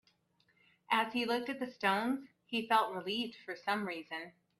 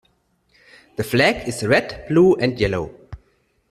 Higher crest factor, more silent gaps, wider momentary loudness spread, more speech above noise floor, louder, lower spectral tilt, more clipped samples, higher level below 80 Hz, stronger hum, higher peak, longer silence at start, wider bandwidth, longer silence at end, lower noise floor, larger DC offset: about the same, 22 dB vs 18 dB; neither; second, 10 LU vs 13 LU; second, 38 dB vs 45 dB; second, -35 LUFS vs -19 LUFS; about the same, -4.5 dB/octave vs -5.5 dB/octave; neither; second, -82 dBFS vs -46 dBFS; neither; second, -14 dBFS vs -2 dBFS; about the same, 0.9 s vs 1 s; about the same, 14.5 kHz vs 14.5 kHz; second, 0.3 s vs 0.55 s; first, -74 dBFS vs -64 dBFS; neither